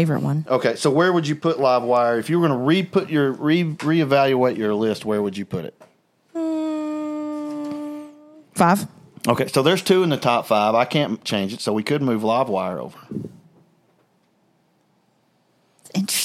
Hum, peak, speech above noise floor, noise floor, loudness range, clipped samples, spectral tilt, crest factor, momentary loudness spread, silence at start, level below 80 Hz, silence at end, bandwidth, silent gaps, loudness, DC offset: none; -2 dBFS; 44 dB; -63 dBFS; 9 LU; under 0.1%; -5.5 dB/octave; 20 dB; 13 LU; 0 s; -66 dBFS; 0 s; 16 kHz; none; -21 LUFS; under 0.1%